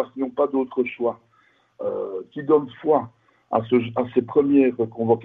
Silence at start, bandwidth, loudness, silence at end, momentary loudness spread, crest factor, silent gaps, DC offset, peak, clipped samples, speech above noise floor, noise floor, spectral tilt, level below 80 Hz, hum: 0 s; 3.9 kHz; -22 LUFS; 0 s; 12 LU; 18 dB; none; under 0.1%; -4 dBFS; under 0.1%; 39 dB; -61 dBFS; -10.5 dB/octave; -64 dBFS; none